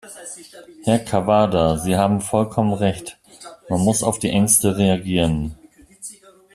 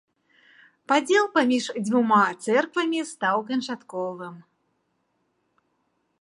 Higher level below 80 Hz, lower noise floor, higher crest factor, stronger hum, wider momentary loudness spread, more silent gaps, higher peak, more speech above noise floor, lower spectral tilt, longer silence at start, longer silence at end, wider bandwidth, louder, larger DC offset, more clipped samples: first, -44 dBFS vs -78 dBFS; second, -43 dBFS vs -73 dBFS; about the same, 20 dB vs 20 dB; neither; first, 21 LU vs 12 LU; neither; first, 0 dBFS vs -6 dBFS; second, 24 dB vs 49 dB; about the same, -5 dB/octave vs -4 dB/octave; second, 0.05 s vs 0.9 s; second, 0.4 s vs 1.8 s; first, 14.5 kHz vs 11.5 kHz; first, -19 LUFS vs -23 LUFS; neither; neither